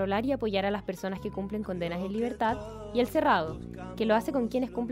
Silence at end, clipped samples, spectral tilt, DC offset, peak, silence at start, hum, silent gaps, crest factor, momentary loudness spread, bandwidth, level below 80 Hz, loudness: 0 s; under 0.1%; -6.5 dB/octave; under 0.1%; -12 dBFS; 0 s; none; none; 16 dB; 9 LU; 16 kHz; -50 dBFS; -30 LUFS